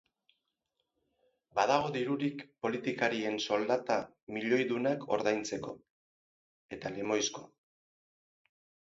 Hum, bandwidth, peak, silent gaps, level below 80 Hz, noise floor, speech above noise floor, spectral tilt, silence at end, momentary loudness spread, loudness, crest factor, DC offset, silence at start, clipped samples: none; 7.6 kHz; -14 dBFS; 4.23-4.27 s, 5.90-6.69 s; -74 dBFS; -84 dBFS; 51 dB; -3 dB/octave; 1.45 s; 12 LU; -33 LUFS; 22 dB; under 0.1%; 1.55 s; under 0.1%